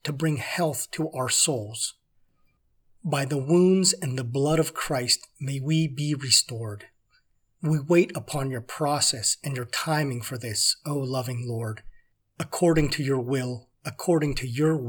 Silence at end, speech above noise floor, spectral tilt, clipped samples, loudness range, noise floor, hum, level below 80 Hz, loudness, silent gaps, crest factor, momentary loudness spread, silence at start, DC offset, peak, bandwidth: 0 s; 41 dB; -4 dB/octave; under 0.1%; 3 LU; -66 dBFS; none; -50 dBFS; -25 LUFS; none; 22 dB; 12 LU; 0.05 s; under 0.1%; -4 dBFS; over 20 kHz